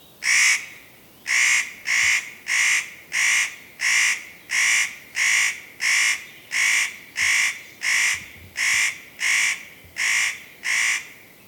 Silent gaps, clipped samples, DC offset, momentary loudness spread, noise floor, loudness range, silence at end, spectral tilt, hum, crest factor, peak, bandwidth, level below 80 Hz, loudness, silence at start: none; under 0.1%; under 0.1%; 9 LU; -48 dBFS; 2 LU; 0.3 s; 3 dB/octave; none; 16 dB; -6 dBFS; 19 kHz; -66 dBFS; -20 LUFS; 0.2 s